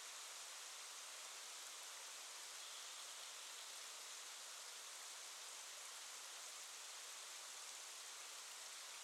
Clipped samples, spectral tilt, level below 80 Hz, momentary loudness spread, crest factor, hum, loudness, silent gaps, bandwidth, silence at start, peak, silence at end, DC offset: under 0.1%; 4.5 dB/octave; under -90 dBFS; 1 LU; 18 dB; none; -51 LUFS; none; 17 kHz; 0 s; -36 dBFS; 0 s; under 0.1%